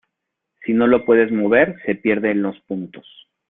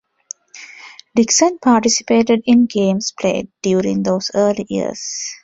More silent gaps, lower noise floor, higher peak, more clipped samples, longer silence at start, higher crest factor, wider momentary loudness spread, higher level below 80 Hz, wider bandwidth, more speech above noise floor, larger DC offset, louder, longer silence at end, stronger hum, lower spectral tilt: neither; first, -79 dBFS vs -40 dBFS; about the same, -2 dBFS vs -2 dBFS; neither; about the same, 0.6 s vs 0.55 s; about the same, 18 dB vs 16 dB; second, 14 LU vs 21 LU; about the same, -58 dBFS vs -56 dBFS; second, 3.9 kHz vs 8 kHz; first, 62 dB vs 24 dB; neither; about the same, -17 LUFS vs -16 LUFS; first, 0.5 s vs 0.05 s; neither; first, -11 dB/octave vs -4 dB/octave